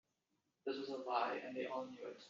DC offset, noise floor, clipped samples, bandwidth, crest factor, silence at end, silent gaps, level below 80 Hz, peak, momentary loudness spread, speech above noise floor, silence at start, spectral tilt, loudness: under 0.1%; -86 dBFS; under 0.1%; 7.4 kHz; 22 dB; 0 s; none; under -90 dBFS; -24 dBFS; 9 LU; 42 dB; 0.65 s; -1.5 dB/octave; -44 LUFS